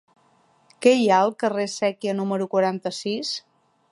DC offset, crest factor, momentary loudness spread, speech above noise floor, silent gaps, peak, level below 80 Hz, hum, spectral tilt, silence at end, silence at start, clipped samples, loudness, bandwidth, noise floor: under 0.1%; 20 dB; 10 LU; 39 dB; none; -2 dBFS; -74 dBFS; none; -4.5 dB/octave; 0.55 s; 0.8 s; under 0.1%; -23 LUFS; 11.5 kHz; -61 dBFS